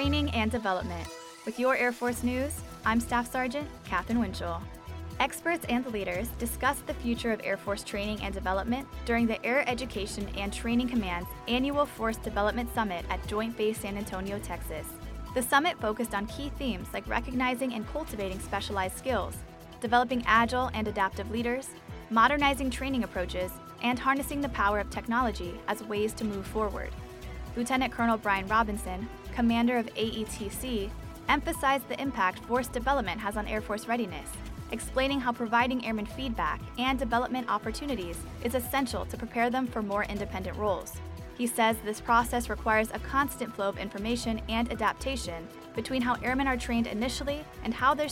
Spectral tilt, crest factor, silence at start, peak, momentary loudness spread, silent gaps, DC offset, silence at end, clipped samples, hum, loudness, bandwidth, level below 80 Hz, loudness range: -4.5 dB/octave; 20 dB; 0 s; -10 dBFS; 10 LU; none; under 0.1%; 0 s; under 0.1%; none; -30 LUFS; 17 kHz; -44 dBFS; 3 LU